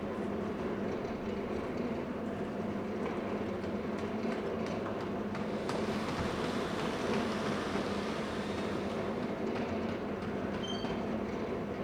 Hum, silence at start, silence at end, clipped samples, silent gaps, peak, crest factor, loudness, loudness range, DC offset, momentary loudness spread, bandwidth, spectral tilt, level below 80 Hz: none; 0 s; 0 s; under 0.1%; none; -20 dBFS; 14 dB; -36 LUFS; 2 LU; under 0.1%; 3 LU; 15.5 kHz; -6 dB/octave; -56 dBFS